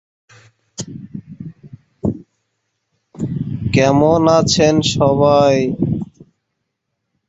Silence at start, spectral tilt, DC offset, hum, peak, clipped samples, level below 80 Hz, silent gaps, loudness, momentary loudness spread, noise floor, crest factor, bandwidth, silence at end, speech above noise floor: 0.8 s; -5.5 dB/octave; under 0.1%; none; -2 dBFS; under 0.1%; -44 dBFS; none; -15 LUFS; 21 LU; -74 dBFS; 16 dB; 8.2 kHz; 1.25 s; 62 dB